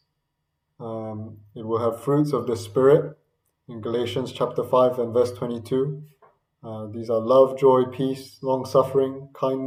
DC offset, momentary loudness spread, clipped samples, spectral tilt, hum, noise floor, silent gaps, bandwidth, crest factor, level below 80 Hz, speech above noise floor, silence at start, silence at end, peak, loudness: under 0.1%; 18 LU; under 0.1%; -7.5 dB/octave; none; -77 dBFS; none; 15.5 kHz; 18 dB; -68 dBFS; 55 dB; 0.8 s; 0 s; -4 dBFS; -23 LUFS